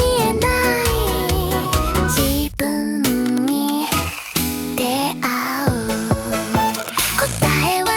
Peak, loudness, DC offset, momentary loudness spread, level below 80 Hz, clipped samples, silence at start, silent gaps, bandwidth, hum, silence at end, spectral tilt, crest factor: -2 dBFS; -19 LUFS; under 0.1%; 4 LU; -30 dBFS; under 0.1%; 0 s; none; 18 kHz; none; 0 s; -4 dB/octave; 18 dB